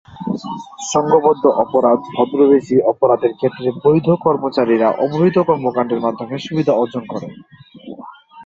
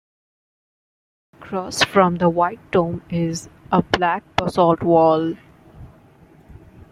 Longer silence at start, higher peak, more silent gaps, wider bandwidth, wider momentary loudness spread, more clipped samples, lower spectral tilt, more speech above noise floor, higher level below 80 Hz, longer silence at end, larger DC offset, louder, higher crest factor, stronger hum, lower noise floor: second, 0.1 s vs 1.4 s; about the same, 0 dBFS vs -2 dBFS; neither; second, 7.8 kHz vs 15 kHz; about the same, 14 LU vs 12 LU; neither; about the same, -6.5 dB/octave vs -5.5 dB/octave; second, 22 dB vs 31 dB; second, -56 dBFS vs -50 dBFS; second, 0 s vs 1.05 s; neither; first, -16 LUFS vs -19 LUFS; about the same, 16 dB vs 20 dB; neither; second, -37 dBFS vs -49 dBFS